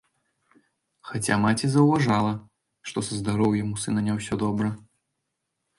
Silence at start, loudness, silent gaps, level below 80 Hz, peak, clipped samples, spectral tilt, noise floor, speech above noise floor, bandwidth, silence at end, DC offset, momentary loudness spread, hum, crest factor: 1.05 s; -25 LUFS; none; -54 dBFS; -6 dBFS; under 0.1%; -6 dB/octave; -80 dBFS; 56 dB; 11.5 kHz; 1 s; under 0.1%; 14 LU; none; 20 dB